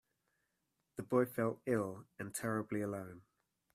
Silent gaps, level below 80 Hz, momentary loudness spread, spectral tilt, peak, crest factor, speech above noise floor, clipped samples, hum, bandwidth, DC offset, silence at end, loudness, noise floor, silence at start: none; -78 dBFS; 14 LU; -6.5 dB/octave; -20 dBFS; 20 dB; 47 dB; under 0.1%; none; 15.5 kHz; under 0.1%; 0.55 s; -39 LUFS; -85 dBFS; 0.95 s